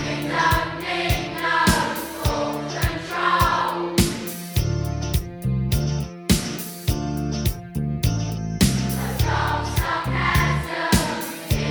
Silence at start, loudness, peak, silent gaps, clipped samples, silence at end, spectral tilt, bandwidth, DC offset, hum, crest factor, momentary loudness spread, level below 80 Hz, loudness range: 0 s; -23 LUFS; -2 dBFS; none; under 0.1%; 0 s; -4.5 dB/octave; over 20 kHz; under 0.1%; none; 20 dB; 7 LU; -32 dBFS; 3 LU